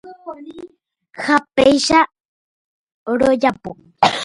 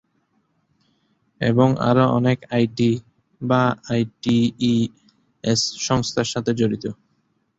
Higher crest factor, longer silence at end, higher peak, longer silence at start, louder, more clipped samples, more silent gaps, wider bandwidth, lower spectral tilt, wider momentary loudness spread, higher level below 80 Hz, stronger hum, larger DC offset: about the same, 18 dB vs 18 dB; second, 0 s vs 0.65 s; about the same, 0 dBFS vs -2 dBFS; second, 0.05 s vs 1.4 s; first, -16 LUFS vs -21 LUFS; neither; first, 2.20-2.87 s, 2.94-3.06 s vs none; first, 11.5 kHz vs 8 kHz; second, -3.5 dB/octave vs -5.5 dB/octave; first, 21 LU vs 9 LU; about the same, -50 dBFS vs -54 dBFS; neither; neither